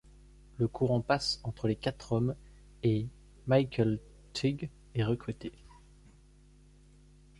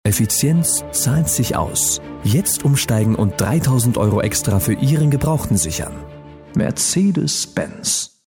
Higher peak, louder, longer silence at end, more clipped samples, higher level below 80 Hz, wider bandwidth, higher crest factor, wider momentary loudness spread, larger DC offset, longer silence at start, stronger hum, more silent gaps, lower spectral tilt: second, -14 dBFS vs -4 dBFS; second, -32 LUFS vs -17 LUFS; first, 1.9 s vs 0.2 s; neither; second, -54 dBFS vs -38 dBFS; second, 11.5 kHz vs 18 kHz; first, 20 dB vs 14 dB; first, 14 LU vs 6 LU; neither; first, 0.6 s vs 0.05 s; first, 50 Hz at -55 dBFS vs none; neither; first, -6.5 dB/octave vs -4.5 dB/octave